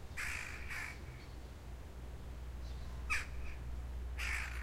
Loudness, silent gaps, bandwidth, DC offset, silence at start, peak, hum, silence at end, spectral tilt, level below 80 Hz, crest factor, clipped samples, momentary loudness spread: -44 LUFS; none; 16 kHz; under 0.1%; 0 s; -24 dBFS; none; 0 s; -3.5 dB/octave; -46 dBFS; 20 dB; under 0.1%; 12 LU